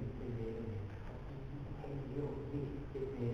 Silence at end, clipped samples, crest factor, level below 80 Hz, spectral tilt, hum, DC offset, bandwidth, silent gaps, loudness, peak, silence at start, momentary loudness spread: 0 s; under 0.1%; 16 dB; -52 dBFS; -9.5 dB/octave; none; under 0.1%; 6.8 kHz; none; -44 LUFS; -28 dBFS; 0 s; 6 LU